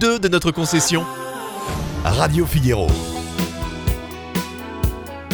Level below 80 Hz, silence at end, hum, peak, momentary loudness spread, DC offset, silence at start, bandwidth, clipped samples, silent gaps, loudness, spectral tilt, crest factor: -30 dBFS; 0 s; none; -2 dBFS; 11 LU; under 0.1%; 0 s; over 20 kHz; under 0.1%; none; -21 LUFS; -4.5 dB/octave; 18 dB